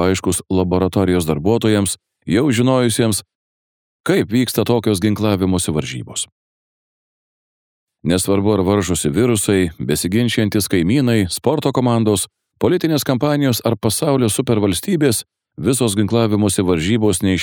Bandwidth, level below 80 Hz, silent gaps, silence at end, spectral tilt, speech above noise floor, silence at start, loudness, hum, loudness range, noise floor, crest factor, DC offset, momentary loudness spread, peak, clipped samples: over 20 kHz; -44 dBFS; 3.35-4.04 s, 6.32-7.87 s; 0 s; -5 dB/octave; over 74 dB; 0 s; -17 LUFS; none; 4 LU; under -90 dBFS; 16 dB; under 0.1%; 6 LU; -2 dBFS; under 0.1%